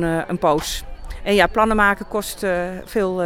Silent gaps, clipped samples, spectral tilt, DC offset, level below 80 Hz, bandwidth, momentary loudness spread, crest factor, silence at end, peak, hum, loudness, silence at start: none; under 0.1%; -4.5 dB/octave; under 0.1%; -34 dBFS; 17.5 kHz; 12 LU; 18 dB; 0 s; -2 dBFS; none; -20 LUFS; 0 s